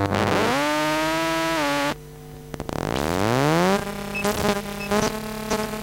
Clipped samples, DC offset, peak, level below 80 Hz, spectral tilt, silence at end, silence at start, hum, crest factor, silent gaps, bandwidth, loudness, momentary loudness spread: under 0.1%; under 0.1%; -4 dBFS; -44 dBFS; -4.5 dB/octave; 0 s; 0 s; none; 20 dB; none; 17 kHz; -23 LUFS; 11 LU